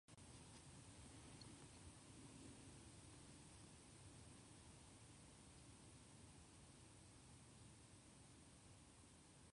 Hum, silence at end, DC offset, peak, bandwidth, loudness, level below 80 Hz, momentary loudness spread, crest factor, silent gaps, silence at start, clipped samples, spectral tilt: none; 0 s; under 0.1%; -48 dBFS; 11 kHz; -64 LUFS; -74 dBFS; 4 LU; 16 dB; none; 0.1 s; under 0.1%; -4 dB/octave